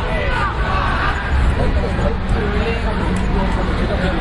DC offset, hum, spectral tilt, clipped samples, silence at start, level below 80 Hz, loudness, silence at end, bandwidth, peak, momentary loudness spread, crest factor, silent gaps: under 0.1%; none; -6.5 dB/octave; under 0.1%; 0 s; -20 dBFS; -19 LUFS; 0 s; 11 kHz; -4 dBFS; 2 LU; 12 dB; none